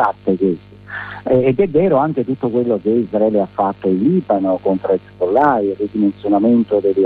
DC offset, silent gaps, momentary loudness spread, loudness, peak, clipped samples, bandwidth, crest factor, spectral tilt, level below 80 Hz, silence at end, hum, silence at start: under 0.1%; none; 6 LU; -16 LUFS; -2 dBFS; under 0.1%; 4.7 kHz; 14 dB; -10.5 dB/octave; -50 dBFS; 0 s; 50 Hz at -45 dBFS; 0 s